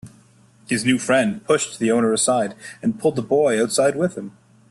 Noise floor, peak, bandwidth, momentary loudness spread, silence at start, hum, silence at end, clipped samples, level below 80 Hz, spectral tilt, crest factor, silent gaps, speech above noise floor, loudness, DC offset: -53 dBFS; -4 dBFS; 12.5 kHz; 8 LU; 0.05 s; none; 0.4 s; under 0.1%; -60 dBFS; -4 dB/octave; 16 dB; none; 33 dB; -20 LUFS; under 0.1%